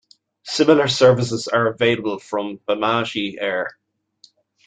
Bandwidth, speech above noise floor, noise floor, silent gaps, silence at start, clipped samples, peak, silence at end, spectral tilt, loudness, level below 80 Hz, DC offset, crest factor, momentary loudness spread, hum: 9.4 kHz; 36 dB; -55 dBFS; none; 0.45 s; under 0.1%; -2 dBFS; 0.95 s; -5 dB/octave; -19 LUFS; -60 dBFS; under 0.1%; 18 dB; 11 LU; none